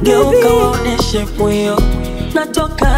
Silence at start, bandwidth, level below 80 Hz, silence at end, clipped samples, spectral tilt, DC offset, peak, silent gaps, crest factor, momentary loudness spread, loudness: 0 s; 16.5 kHz; -20 dBFS; 0 s; under 0.1%; -5.5 dB/octave; under 0.1%; 0 dBFS; none; 12 dB; 8 LU; -14 LUFS